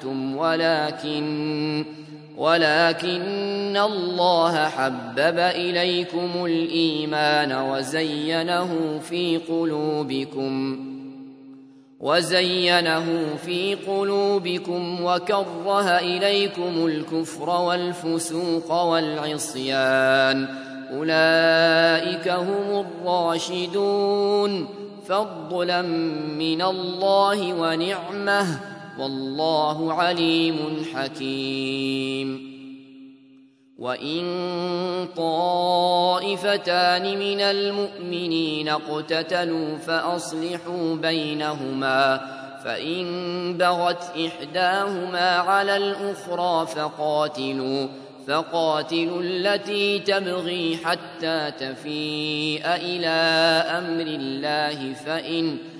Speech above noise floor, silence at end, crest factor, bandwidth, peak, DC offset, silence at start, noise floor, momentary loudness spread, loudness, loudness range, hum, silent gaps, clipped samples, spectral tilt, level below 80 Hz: 30 dB; 0 s; 20 dB; 11 kHz; -2 dBFS; under 0.1%; 0 s; -53 dBFS; 9 LU; -23 LUFS; 4 LU; none; none; under 0.1%; -4.5 dB/octave; -74 dBFS